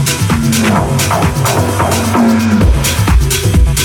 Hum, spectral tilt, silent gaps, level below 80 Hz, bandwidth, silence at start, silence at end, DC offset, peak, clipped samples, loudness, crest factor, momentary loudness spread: none; -5 dB/octave; none; -16 dBFS; 18.5 kHz; 0 s; 0 s; under 0.1%; 0 dBFS; under 0.1%; -11 LUFS; 10 dB; 2 LU